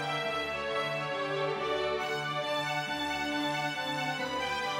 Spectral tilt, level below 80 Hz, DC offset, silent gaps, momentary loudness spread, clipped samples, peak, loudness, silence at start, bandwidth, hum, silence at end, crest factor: -3.5 dB/octave; -62 dBFS; under 0.1%; none; 1 LU; under 0.1%; -20 dBFS; -32 LUFS; 0 s; 16 kHz; none; 0 s; 12 dB